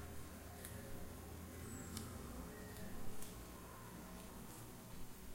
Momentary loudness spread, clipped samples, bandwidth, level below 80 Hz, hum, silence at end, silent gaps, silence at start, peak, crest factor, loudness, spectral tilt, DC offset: 5 LU; under 0.1%; 16 kHz; -58 dBFS; none; 0 s; none; 0 s; -26 dBFS; 22 dB; -53 LUFS; -4.5 dB/octave; under 0.1%